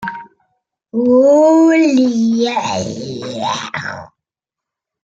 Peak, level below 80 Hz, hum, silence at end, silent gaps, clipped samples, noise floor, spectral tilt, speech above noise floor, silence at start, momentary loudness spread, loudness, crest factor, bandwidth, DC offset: -2 dBFS; -62 dBFS; none; 1 s; none; under 0.1%; -85 dBFS; -5 dB/octave; 72 dB; 0 s; 17 LU; -14 LUFS; 12 dB; 7.8 kHz; under 0.1%